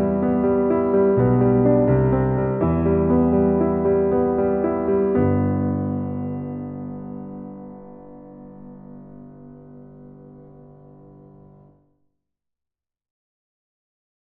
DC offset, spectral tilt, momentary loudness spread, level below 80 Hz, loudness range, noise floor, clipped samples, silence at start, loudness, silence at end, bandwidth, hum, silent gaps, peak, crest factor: under 0.1%; -14 dB/octave; 24 LU; -44 dBFS; 23 LU; -87 dBFS; under 0.1%; 0 s; -20 LUFS; 3.9 s; 3 kHz; none; none; -6 dBFS; 16 dB